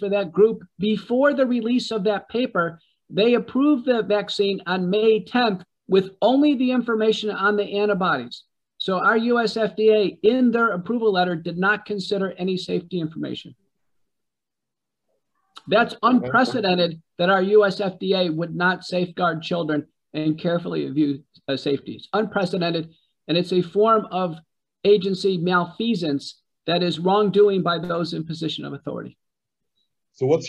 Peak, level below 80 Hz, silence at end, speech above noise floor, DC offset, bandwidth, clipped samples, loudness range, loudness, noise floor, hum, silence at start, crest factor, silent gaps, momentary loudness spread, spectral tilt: -6 dBFS; -66 dBFS; 0 s; 66 dB; under 0.1%; 9.4 kHz; under 0.1%; 4 LU; -21 LUFS; -87 dBFS; none; 0 s; 16 dB; none; 10 LU; -6.5 dB/octave